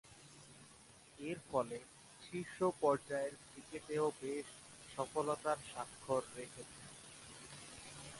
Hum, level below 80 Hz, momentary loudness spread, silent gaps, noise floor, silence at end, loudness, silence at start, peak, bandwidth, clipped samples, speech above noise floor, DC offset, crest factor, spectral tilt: none; -74 dBFS; 20 LU; none; -62 dBFS; 0 s; -42 LUFS; 0.05 s; -20 dBFS; 11.5 kHz; under 0.1%; 22 dB; under 0.1%; 22 dB; -4.5 dB/octave